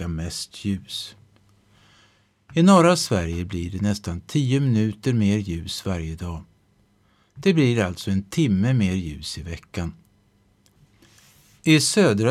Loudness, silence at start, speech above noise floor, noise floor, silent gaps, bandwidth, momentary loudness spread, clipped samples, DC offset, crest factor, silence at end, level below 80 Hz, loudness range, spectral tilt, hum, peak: -22 LUFS; 0 s; 40 dB; -62 dBFS; none; 14.5 kHz; 16 LU; under 0.1%; under 0.1%; 18 dB; 0 s; -46 dBFS; 5 LU; -5.5 dB/octave; none; -4 dBFS